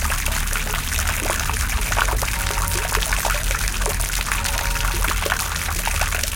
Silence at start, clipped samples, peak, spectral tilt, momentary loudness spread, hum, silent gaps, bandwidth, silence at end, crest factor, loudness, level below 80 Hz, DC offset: 0 s; under 0.1%; -2 dBFS; -2 dB/octave; 2 LU; none; none; 17.5 kHz; 0 s; 20 dB; -21 LUFS; -24 dBFS; under 0.1%